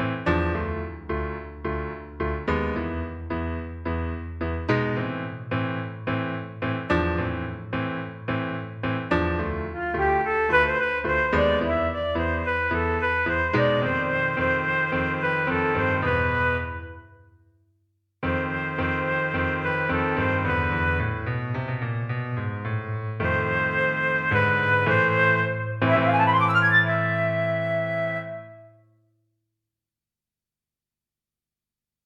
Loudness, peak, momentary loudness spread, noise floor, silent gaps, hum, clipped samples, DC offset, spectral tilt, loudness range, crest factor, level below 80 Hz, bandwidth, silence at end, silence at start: -24 LUFS; -8 dBFS; 11 LU; -90 dBFS; none; 50 Hz at -60 dBFS; under 0.1%; under 0.1%; -8 dB/octave; 8 LU; 18 dB; -40 dBFS; 7.6 kHz; 3.35 s; 0 s